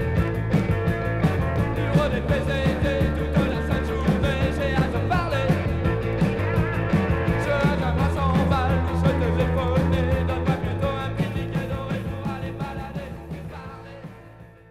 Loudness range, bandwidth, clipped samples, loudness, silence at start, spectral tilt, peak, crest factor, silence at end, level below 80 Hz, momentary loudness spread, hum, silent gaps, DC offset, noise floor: 6 LU; 14.5 kHz; under 0.1%; -23 LUFS; 0 s; -7.5 dB/octave; -8 dBFS; 14 dB; 0.2 s; -32 dBFS; 10 LU; none; none; under 0.1%; -45 dBFS